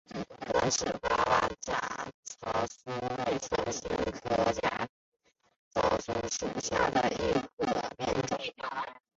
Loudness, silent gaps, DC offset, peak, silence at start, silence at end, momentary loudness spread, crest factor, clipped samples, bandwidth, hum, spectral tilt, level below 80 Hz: -32 LUFS; 2.14-2.23 s, 4.89-5.12 s, 5.59-5.71 s, 7.53-7.57 s; under 0.1%; -14 dBFS; 0.1 s; 0.2 s; 9 LU; 18 dB; under 0.1%; 8 kHz; none; -3.5 dB/octave; -54 dBFS